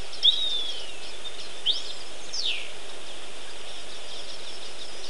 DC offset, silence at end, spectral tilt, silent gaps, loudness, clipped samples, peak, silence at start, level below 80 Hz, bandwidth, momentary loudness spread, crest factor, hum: 5%; 0 s; -0.5 dB/octave; none; -29 LUFS; under 0.1%; -6 dBFS; 0 s; -62 dBFS; 13.5 kHz; 17 LU; 24 dB; none